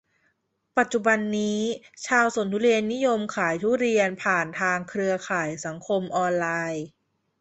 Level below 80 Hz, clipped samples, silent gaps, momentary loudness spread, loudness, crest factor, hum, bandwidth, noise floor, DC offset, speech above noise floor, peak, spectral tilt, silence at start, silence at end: -68 dBFS; under 0.1%; none; 8 LU; -25 LUFS; 20 dB; none; 8.2 kHz; -72 dBFS; under 0.1%; 48 dB; -6 dBFS; -4.5 dB/octave; 0.75 s; 0.55 s